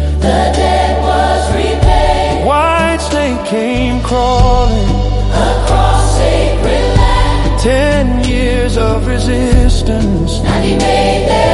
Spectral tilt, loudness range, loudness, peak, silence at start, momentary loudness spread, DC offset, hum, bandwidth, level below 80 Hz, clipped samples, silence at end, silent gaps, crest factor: -5.5 dB/octave; 1 LU; -12 LUFS; 0 dBFS; 0 s; 3 LU; under 0.1%; none; 11.5 kHz; -14 dBFS; 0.2%; 0 s; none; 10 dB